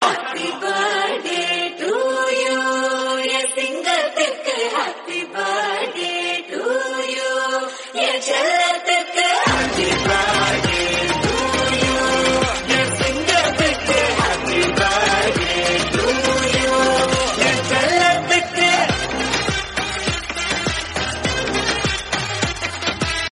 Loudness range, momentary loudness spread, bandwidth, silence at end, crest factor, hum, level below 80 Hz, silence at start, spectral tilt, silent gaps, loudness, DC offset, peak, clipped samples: 4 LU; 6 LU; 11.5 kHz; 0.05 s; 18 dB; none; -38 dBFS; 0 s; -3 dB/octave; none; -18 LUFS; under 0.1%; -2 dBFS; under 0.1%